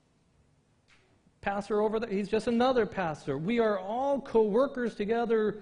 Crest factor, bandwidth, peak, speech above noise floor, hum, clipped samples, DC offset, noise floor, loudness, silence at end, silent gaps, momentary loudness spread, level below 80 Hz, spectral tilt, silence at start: 16 dB; 10.5 kHz; -14 dBFS; 39 dB; none; under 0.1%; under 0.1%; -67 dBFS; -29 LUFS; 0 s; none; 7 LU; -60 dBFS; -6.5 dB/octave; 1.45 s